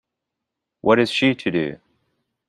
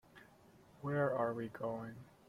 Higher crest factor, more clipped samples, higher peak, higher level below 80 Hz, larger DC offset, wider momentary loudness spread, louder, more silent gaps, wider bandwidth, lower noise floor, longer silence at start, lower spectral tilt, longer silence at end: about the same, 20 dB vs 18 dB; neither; first, -2 dBFS vs -22 dBFS; first, -60 dBFS vs -74 dBFS; neither; second, 9 LU vs 12 LU; first, -20 LUFS vs -39 LUFS; neither; second, 11.5 kHz vs 14.5 kHz; first, -82 dBFS vs -64 dBFS; first, 0.85 s vs 0.15 s; second, -5.5 dB/octave vs -8.5 dB/octave; first, 0.75 s vs 0.2 s